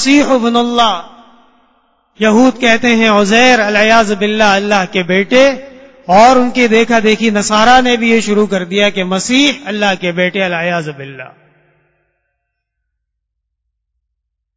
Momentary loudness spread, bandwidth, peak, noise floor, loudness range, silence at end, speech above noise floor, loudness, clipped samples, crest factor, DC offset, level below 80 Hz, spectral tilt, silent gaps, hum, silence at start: 8 LU; 8 kHz; 0 dBFS; -73 dBFS; 8 LU; 3.3 s; 63 dB; -10 LUFS; 0.3%; 12 dB; under 0.1%; -46 dBFS; -4 dB/octave; none; none; 0 s